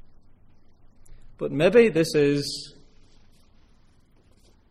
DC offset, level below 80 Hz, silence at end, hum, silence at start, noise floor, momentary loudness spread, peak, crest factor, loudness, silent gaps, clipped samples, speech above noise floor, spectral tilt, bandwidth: under 0.1%; -52 dBFS; 2 s; none; 1.1 s; -57 dBFS; 17 LU; -6 dBFS; 22 dB; -22 LUFS; none; under 0.1%; 36 dB; -5.5 dB/octave; 15 kHz